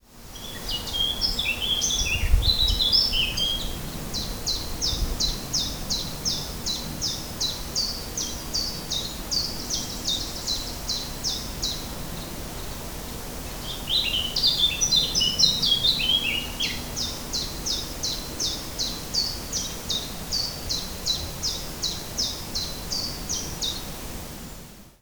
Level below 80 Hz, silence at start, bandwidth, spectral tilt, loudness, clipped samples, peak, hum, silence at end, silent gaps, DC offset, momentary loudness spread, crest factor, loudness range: -36 dBFS; 0.1 s; over 20 kHz; -1.5 dB/octave; -25 LUFS; under 0.1%; -4 dBFS; none; 0.1 s; none; under 0.1%; 15 LU; 22 dB; 8 LU